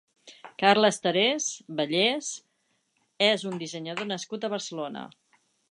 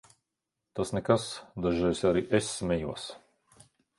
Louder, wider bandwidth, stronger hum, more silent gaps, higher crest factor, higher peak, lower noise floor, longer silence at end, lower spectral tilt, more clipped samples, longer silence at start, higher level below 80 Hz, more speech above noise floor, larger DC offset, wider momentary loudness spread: first, -26 LUFS vs -30 LUFS; about the same, 11 kHz vs 11.5 kHz; neither; neither; about the same, 20 dB vs 24 dB; about the same, -8 dBFS vs -8 dBFS; second, -73 dBFS vs -86 dBFS; second, 0.65 s vs 0.8 s; second, -3 dB/octave vs -5.5 dB/octave; neither; second, 0.25 s vs 0.75 s; second, -78 dBFS vs -52 dBFS; second, 46 dB vs 57 dB; neither; about the same, 15 LU vs 13 LU